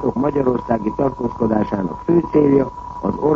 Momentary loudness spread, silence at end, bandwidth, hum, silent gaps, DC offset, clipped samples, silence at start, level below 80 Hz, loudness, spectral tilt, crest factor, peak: 8 LU; 0 s; 7.2 kHz; none; none; under 0.1%; under 0.1%; 0 s; -40 dBFS; -19 LUFS; -10 dB/octave; 16 dB; -2 dBFS